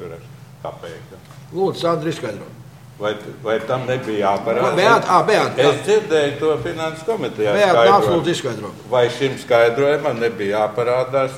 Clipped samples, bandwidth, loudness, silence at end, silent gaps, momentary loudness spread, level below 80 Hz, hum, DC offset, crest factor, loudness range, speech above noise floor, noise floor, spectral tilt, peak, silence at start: under 0.1%; 16 kHz; -18 LUFS; 0 s; none; 18 LU; -56 dBFS; none; 0.1%; 18 dB; 8 LU; 21 dB; -39 dBFS; -5 dB/octave; 0 dBFS; 0 s